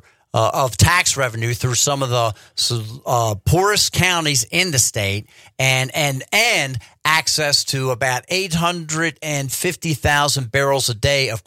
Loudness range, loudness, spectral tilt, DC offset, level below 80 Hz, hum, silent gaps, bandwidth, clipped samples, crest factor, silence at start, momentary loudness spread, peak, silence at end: 2 LU; -17 LUFS; -3 dB/octave; under 0.1%; -42 dBFS; none; none; 16.5 kHz; under 0.1%; 16 dB; 0.35 s; 7 LU; -2 dBFS; 0.05 s